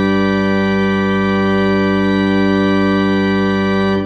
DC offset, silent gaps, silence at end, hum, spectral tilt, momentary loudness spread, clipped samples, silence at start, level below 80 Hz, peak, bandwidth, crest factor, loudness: under 0.1%; none; 0 s; 50 Hz at -60 dBFS; -7.5 dB/octave; 1 LU; under 0.1%; 0 s; -40 dBFS; -2 dBFS; 7.4 kHz; 12 dB; -14 LUFS